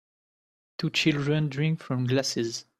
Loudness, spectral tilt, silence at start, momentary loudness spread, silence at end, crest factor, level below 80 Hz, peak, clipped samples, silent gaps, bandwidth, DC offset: -27 LUFS; -5 dB/octave; 0.8 s; 7 LU; 0.15 s; 20 dB; -64 dBFS; -8 dBFS; under 0.1%; none; 13.5 kHz; under 0.1%